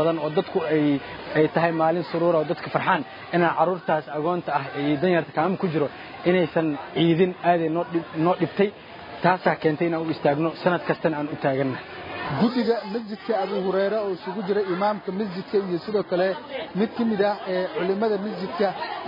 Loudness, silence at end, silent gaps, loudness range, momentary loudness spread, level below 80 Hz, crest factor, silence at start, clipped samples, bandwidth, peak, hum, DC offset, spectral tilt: -24 LUFS; 0 s; none; 3 LU; 7 LU; -64 dBFS; 18 dB; 0 s; under 0.1%; 5.4 kHz; -4 dBFS; none; under 0.1%; -9 dB/octave